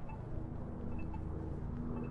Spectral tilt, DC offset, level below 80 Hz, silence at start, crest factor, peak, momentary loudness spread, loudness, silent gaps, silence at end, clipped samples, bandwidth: -10.5 dB/octave; under 0.1%; -48 dBFS; 0 s; 12 dB; -28 dBFS; 3 LU; -44 LUFS; none; 0 s; under 0.1%; 4.9 kHz